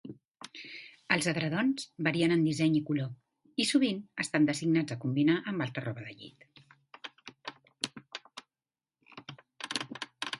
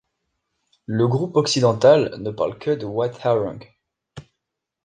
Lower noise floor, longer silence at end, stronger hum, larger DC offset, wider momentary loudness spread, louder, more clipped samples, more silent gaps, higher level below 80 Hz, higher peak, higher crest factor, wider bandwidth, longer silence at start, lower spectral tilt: first, under -90 dBFS vs -81 dBFS; second, 0 s vs 0.65 s; neither; neither; first, 21 LU vs 13 LU; second, -31 LUFS vs -20 LUFS; neither; neither; second, -74 dBFS vs -58 dBFS; second, -10 dBFS vs -2 dBFS; about the same, 22 dB vs 20 dB; first, 11.5 kHz vs 9.8 kHz; second, 0.05 s vs 0.9 s; about the same, -5 dB/octave vs -5.5 dB/octave